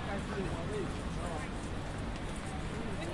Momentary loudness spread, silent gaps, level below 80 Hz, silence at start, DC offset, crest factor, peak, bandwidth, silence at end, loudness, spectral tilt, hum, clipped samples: 3 LU; none; -44 dBFS; 0 s; under 0.1%; 14 dB; -24 dBFS; 11.5 kHz; 0 s; -39 LUFS; -5.5 dB/octave; none; under 0.1%